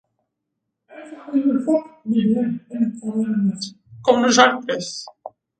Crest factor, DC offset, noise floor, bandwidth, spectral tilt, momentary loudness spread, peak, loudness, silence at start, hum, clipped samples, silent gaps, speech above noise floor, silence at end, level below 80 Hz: 20 dB; under 0.1%; -79 dBFS; 9.4 kHz; -4.5 dB/octave; 18 LU; 0 dBFS; -20 LUFS; 0.9 s; none; under 0.1%; none; 59 dB; 0.3 s; -66 dBFS